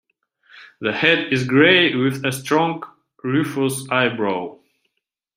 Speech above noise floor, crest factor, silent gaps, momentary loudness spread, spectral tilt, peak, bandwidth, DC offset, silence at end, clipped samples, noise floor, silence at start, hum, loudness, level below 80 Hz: 58 dB; 20 dB; none; 15 LU; -4.5 dB/octave; 0 dBFS; 16 kHz; under 0.1%; 0.8 s; under 0.1%; -77 dBFS; 0.55 s; none; -18 LUFS; -62 dBFS